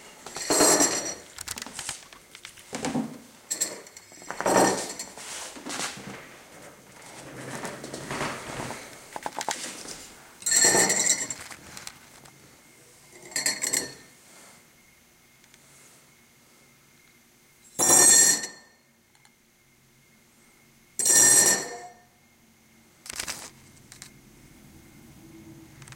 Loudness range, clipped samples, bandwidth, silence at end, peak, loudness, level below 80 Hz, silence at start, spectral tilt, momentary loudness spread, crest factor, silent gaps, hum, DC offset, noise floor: 15 LU; under 0.1%; 17 kHz; 0 s; -4 dBFS; -22 LUFS; -64 dBFS; 0.05 s; -0.5 dB/octave; 26 LU; 26 dB; none; none; under 0.1%; -61 dBFS